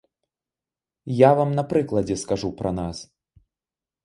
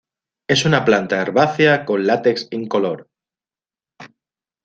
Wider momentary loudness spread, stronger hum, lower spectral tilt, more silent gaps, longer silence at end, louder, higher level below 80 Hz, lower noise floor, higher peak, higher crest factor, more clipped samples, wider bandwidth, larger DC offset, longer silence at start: first, 15 LU vs 10 LU; neither; first, -6.5 dB/octave vs -5 dB/octave; neither; first, 1 s vs 0.6 s; second, -22 LUFS vs -17 LUFS; first, -50 dBFS vs -60 dBFS; about the same, under -90 dBFS vs under -90 dBFS; about the same, -2 dBFS vs -2 dBFS; first, 24 dB vs 18 dB; neither; first, 11.5 kHz vs 9 kHz; neither; first, 1.05 s vs 0.5 s